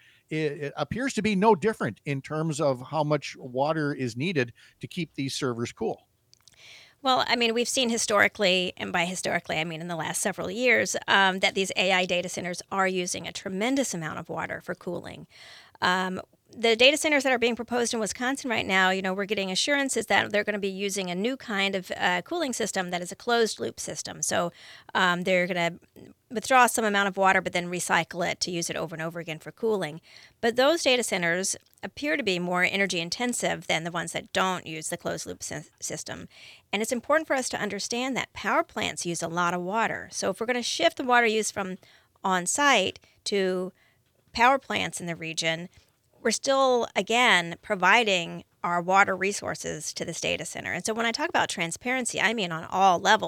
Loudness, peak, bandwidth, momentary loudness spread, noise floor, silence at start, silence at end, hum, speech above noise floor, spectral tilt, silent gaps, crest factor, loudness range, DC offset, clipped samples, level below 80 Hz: -26 LUFS; -4 dBFS; 18.5 kHz; 12 LU; -65 dBFS; 0.3 s; 0 s; none; 39 dB; -3 dB/octave; none; 24 dB; 6 LU; under 0.1%; under 0.1%; -66 dBFS